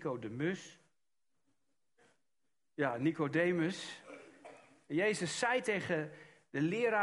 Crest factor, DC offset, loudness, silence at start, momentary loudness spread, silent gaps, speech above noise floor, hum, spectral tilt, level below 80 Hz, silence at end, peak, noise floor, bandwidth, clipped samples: 20 dB; under 0.1%; -35 LUFS; 0 s; 20 LU; none; 54 dB; none; -5 dB/octave; -78 dBFS; 0 s; -18 dBFS; -89 dBFS; 11.5 kHz; under 0.1%